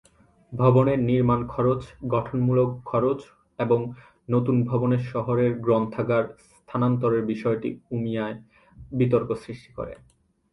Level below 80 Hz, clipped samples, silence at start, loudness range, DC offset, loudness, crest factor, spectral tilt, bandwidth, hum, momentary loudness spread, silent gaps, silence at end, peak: -52 dBFS; under 0.1%; 0.5 s; 4 LU; under 0.1%; -24 LUFS; 18 dB; -10 dB/octave; 5.8 kHz; none; 14 LU; none; 0.55 s; -6 dBFS